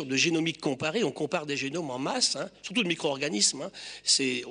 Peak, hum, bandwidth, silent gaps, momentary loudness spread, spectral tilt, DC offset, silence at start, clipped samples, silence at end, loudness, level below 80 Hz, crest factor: -10 dBFS; none; 10 kHz; none; 8 LU; -2.5 dB/octave; under 0.1%; 0 s; under 0.1%; 0 s; -27 LUFS; -70 dBFS; 18 dB